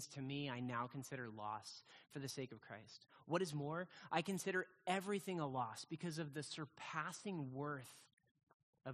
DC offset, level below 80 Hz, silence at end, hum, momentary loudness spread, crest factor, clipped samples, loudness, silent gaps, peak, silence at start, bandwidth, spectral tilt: under 0.1%; -84 dBFS; 0 s; none; 14 LU; 24 dB; under 0.1%; -46 LUFS; 8.13-8.17 s, 8.31-8.35 s, 8.43-8.47 s, 8.54-8.73 s; -22 dBFS; 0 s; 13 kHz; -5 dB/octave